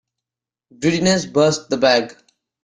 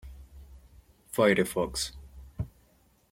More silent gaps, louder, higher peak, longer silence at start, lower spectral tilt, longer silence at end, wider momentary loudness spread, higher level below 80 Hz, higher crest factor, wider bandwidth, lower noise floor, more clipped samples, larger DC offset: neither; first, -17 LUFS vs -29 LUFS; first, -2 dBFS vs -8 dBFS; first, 0.8 s vs 0.05 s; about the same, -4.5 dB/octave vs -4.5 dB/octave; second, 0.5 s vs 0.65 s; second, 5 LU vs 26 LU; about the same, -54 dBFS vs -50 dBFS; second, 18 dB vs 24 dB; second, 10 kHz vs 16.5 kHz; first, -88 dBFS vs -65 dBFS; neither; neither